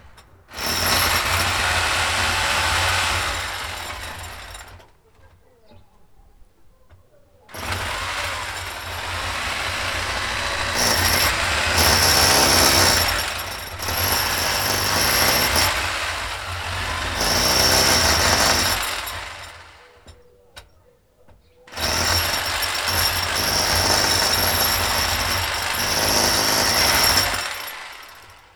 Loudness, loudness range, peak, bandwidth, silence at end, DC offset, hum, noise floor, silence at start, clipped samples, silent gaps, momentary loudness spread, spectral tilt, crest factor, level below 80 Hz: -18 LUFS; 13 LU; -2 dBFS; over 20 kHz; 0.25 s; under 0.1%; none; -56 dBFS; 0.05 s; under 0.1%; none; 15 LU; -1.5 dB/octave; 20 dB; -36 dBFS